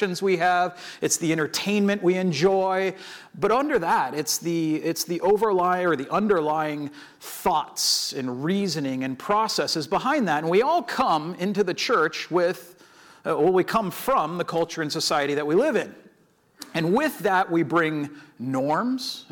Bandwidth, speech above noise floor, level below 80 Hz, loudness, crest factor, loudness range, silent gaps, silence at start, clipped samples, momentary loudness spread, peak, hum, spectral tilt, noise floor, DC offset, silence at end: over 20 kHz; 37 dB; -62 dBFS; -23 LUFS; 16 dB; 2 LU; none; 0 s; under 0.1%; 8 LU; -8 dBFS; none; -4 dB/octave; -61 dBFS; under 0.1%; 0.1 s